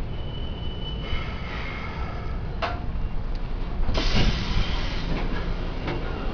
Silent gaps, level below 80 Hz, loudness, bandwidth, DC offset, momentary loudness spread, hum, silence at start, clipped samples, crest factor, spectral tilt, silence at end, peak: none; -28 dBFS; -30 LUFS; 5.4 kHz; under 0.1%; 9 LU; none; 0 s; under 0.1%; 18 dB; -6 dB/octave; 0 s; -8 dBFS